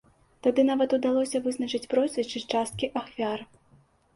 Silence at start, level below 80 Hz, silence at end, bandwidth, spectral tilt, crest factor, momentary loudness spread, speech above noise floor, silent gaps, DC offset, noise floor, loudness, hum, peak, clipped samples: 0.45 s; -64 dBFS; 0.7 s; 11.5 kHz; -4.5 dB/octave; 16 dB; 8 LU; 35 dB; none; under 0.1%; -61 dBFS; -27 LUFS; none; -10 dBFS; under 0.1%